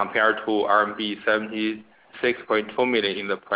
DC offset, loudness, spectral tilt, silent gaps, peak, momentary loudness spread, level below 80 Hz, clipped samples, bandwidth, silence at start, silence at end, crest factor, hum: under 0.1%; -23 LUFS; -7.5 dB/octave; none; -6 dBFS; 7 LU; -64 dBFS; under 0.1%; 4 kHz; 0 s; 0 s; 18 dB; none